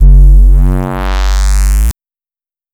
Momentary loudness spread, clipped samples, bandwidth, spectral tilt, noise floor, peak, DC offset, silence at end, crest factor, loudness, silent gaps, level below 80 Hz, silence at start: 9 LU; 2%; 13.5 kHz; -6 dB/octave; under -90 dBFS; 0 dBFS; under 0.1%; 0.8 s; 6 dB; -11 LUFS; none; -8 dBFS; 0 s